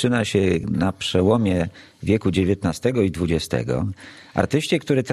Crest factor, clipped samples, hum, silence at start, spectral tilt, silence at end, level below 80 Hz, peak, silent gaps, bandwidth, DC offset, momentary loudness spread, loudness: 18 dB; under 0.1%; none; 0 s; -6 dB/octave; 0 s; -44 dBFS; -2 dBFS; none; 14 kHz; under 0.1%; 8 LU; -22 LUFS